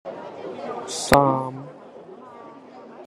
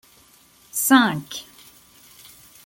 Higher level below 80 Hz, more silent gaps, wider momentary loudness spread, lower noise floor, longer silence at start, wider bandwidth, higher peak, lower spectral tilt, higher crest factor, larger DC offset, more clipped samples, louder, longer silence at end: first, -48 dBFS vs -66 dBFS; neither; first, 26 LU vs 19 LU; second, -43 dBFS vs -54 dBFS; second, 0.05 s vs 0.75 s; second, 13 kHz vs 17 kHz; about the same, 0 dBFS vs -2 dBFS; first, -4.5 dB/octave vs -3 dB/octave; about the same, 26 dB vs 22 dB; neither; neither; second, -22 LUFS vs -19 LUFS; second, 0 s vs 1.25 s